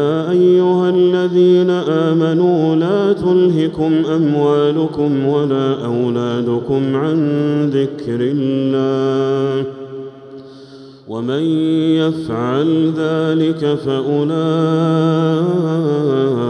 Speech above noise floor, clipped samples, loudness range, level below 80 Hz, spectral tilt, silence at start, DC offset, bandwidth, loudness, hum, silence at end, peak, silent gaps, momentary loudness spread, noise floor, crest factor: 23 dB; under 0.1%; 6 LU; -56 dBFS; -8.5 dB/octave; 0 s; under 0.1%; 8.6 kHz; -15 LUFS; none; 0 s; -4 dBFS; none; 6 LU; -37 dBFS; 12 dB